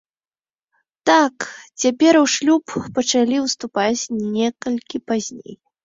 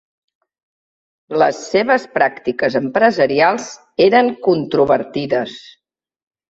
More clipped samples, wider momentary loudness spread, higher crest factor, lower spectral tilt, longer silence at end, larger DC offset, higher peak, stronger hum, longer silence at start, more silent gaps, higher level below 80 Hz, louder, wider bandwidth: neither; first, 12 LU vs 9 LU; about the same, 18 dB vs 16 dB; second, -3 dB/octave vs -5 dB/octave; second, 0.3 s vs 0.9 s; neither; about the same, -2 dBFS vs -2 dBFS; neither; second, 1.05 s vs 1.3 s; neither; about the same, -60 dBFS vs -58 dBFS; second, -19 LUFS vs -16 LUFS; about the same, 7.8 kHz vs 8 kHz